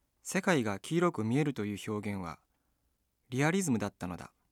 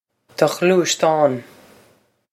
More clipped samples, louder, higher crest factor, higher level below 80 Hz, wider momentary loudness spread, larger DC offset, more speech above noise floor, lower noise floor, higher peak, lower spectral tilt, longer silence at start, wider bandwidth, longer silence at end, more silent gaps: neither; second, -33 LUFS vs -17 LUFS; about the same, 20 dB vs 18 dB; about the same, -70 dBFS vs -70 dBFS; about the same, 12 LU vs 11 LU; neither; first, 46 dB vs 41 dB; first, -78 dBFS vs -57 dBFS; second, -14 dBFS vs 0 dBFS; first, -5.5 dB/octave vs -4 dB/octave; second, 0.25 s vs 0.4 s; about the same, 17 kHz vs 16 kHz; second, 0.25 s vs 0.9 s; neither